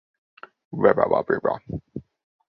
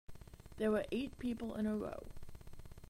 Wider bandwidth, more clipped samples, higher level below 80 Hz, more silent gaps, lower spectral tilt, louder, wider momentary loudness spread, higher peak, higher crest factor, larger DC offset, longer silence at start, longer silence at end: second, 5.6 kHz vs 16 kHz; neither; about the same, -54 dBFS vs -56 dBFS; neither; first, -10.5 dB/octave vs -6.5 dB/octave; first, -22 LUFS vs -40 LUFS; about the same, 20 LU vs 21 LU; first, -2 dBFS vs -22 dBFS; about the same, 22 dB vs 18 dB; neither; first, 0.7 s vs 0.1 s; first, 0.55 s vs 0 s